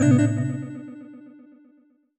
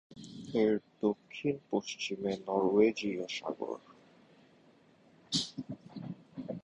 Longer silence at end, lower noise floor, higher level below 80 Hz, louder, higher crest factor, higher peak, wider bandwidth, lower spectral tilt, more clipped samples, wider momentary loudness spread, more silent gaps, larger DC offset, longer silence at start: first, 0.9 s vs 0.05 s; second, -59 dBFS vs -63 dBFS; first, -62 dBFS vs -72 dBFS; first, -23 LUFS vs -34 LUFS; second, 16 dB vs 22 dB; first, -8 dBFS vs -14 dBFS; second, 8.6 kHz vs 11 kHz; first, -7.5 dB/octave vs -5 dB/octave; neither; first, 25 LU vs 17 LU; neither; neither; about the same, 0 s vs 0.1 s